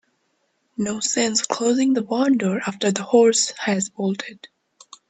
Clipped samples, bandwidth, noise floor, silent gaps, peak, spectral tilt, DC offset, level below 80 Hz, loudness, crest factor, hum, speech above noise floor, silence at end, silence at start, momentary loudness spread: under 0.1%; 9.4 kHz; -69 dBFS; none; -2 dBFS; -3.5 dB/octave; under 0.1%; -68 dBFS; -20 LUFS; 20 dB; none; 49 dB; 0.65 s; 0.8 s; 11 LU